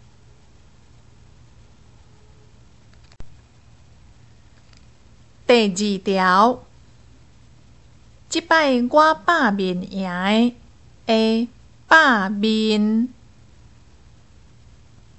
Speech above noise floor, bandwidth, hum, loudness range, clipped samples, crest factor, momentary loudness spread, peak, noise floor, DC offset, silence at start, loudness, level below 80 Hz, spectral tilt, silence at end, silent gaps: 34 dB; 8.4 kHz; none; 4 LU; under 0.1%; 20 dB; 11 LU; -2 dBFS; -51 dBFS; 0.3%; 3.2 s; -18 LUFS; -54 dBFS; -4.5 dB/octave; 2.1 s; none